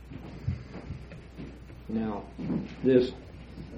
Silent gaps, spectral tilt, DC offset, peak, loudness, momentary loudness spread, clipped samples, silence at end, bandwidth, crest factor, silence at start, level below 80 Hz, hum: none; -8.5 dB/octave; under 0.1%; -10 dBFS; -31 LUFS; 21 LU; under 0.1%; 0 s; 7.8 kHz; 22 dB; 0 s; -48 dBFS; none